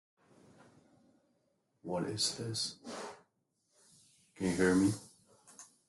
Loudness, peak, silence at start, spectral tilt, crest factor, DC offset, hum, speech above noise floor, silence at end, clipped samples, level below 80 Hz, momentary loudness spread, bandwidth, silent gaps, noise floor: -34 LUFS; -16 dBFS; 1.85 s; -4 dB/octave; 22 dB; under 0.1%; none; 46 dB; 0.25 s; under 0.1%; -72 dBFS; 21 LU; 12.5 kHz; none; -79 dBFS